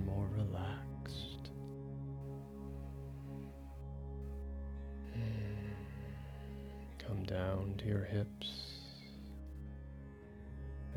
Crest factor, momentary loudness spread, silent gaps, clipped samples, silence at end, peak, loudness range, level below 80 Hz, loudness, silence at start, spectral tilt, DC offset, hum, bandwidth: 18 dB; 12 LU; none; under 0.1%; 0 s; -24 dBFS; 6 LU; -50 dBFS; -44 LUFS; 0 s; -7.5 dB/octave; under 0.1%; none; 14 kHz